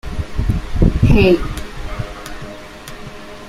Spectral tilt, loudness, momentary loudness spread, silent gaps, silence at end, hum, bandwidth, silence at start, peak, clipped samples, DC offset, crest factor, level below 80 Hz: -7 dB/octave; -17 LUFS; 21 LU; none; 0 s; none; 15.5 kHz; 0.05 s; -2 dBFS; under 0.1%; under 0.1%; 16 dB; -22 dBFS